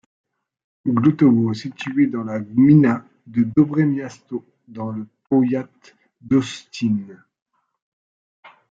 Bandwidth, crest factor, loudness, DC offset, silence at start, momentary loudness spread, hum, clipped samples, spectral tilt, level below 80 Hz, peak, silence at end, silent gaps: 7.8 kHz; 18 dB; -19 LUFS; under 0.1%; 0.85 s; 16 LU; none; under 0.1%; -8 dB/octave; -62 dBFS; -4 dBFS; 0.25 s; 7.42-7.46 s, 7.82-8.43 s